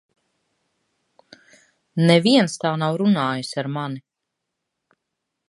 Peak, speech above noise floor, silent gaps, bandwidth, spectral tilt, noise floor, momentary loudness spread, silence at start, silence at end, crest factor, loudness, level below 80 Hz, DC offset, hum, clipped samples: -2 dBFS; 62 dB; none; 11.5 kHz; -6 dB/octave; -81 dBFS; 15 LU; 1.95 s; 1.5 s; 22 dB; -20 LUFS; -72 dBFS; under 0.1%; none; under 0.1%